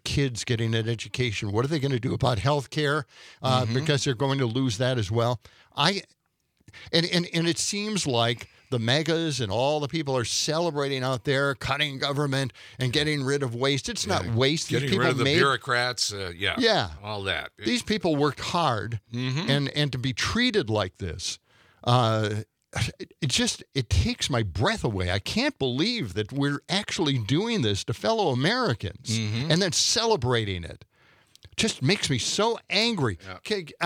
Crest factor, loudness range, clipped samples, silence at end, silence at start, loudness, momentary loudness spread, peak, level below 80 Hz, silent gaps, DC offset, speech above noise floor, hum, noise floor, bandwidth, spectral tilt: 22 dB; 2 LU; under 0.1%; 0 s; 0.05 s; -26 LUFS; 8 LU; -4 dBFS; -50 dBFS; none; under 0.1%; 45 dB; none; -71 dBFS; 15.5 kHz; -4.5 dB/octave